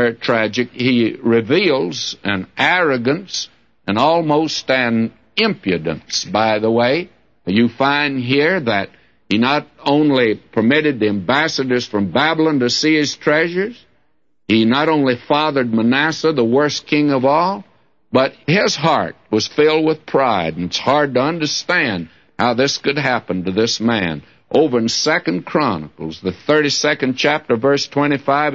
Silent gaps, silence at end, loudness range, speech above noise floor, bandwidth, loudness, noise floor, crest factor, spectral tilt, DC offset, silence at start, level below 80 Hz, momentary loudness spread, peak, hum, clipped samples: none; 0 s; 2 LU; 51 dB; 7.6 kHz; -16 LUFS; -67 dBFS; 16 dB; -4.5 dB/octave; 0.1%; 0 s; -56 dBFS; 7 LU; -2 dBFS; none; under 0.1%